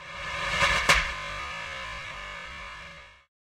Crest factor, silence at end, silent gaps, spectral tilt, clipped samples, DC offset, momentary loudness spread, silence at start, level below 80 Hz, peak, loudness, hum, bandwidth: 24 dB; 0.4 s; none; -1.5 dB/octave; under 0.1%; under 0.1%; 19 LU; 0 s; -44 dBFS; -6 dBFS; -27 LUFS; none; 16 kHz